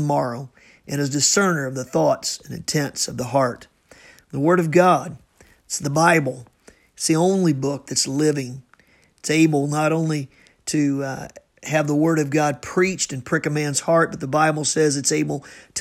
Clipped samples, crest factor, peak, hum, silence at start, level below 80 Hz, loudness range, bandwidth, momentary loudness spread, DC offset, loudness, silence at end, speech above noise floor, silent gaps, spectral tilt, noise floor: under 0.1%; 18 dB; -2 dBFS; none; 0 s; -58 dBFS; 2 LU; 16 kHz; 14 LU; under 0.1%; -20 LUFS; 0 s; 36 dB; none; -4.5 dB/octave; -56 dBFS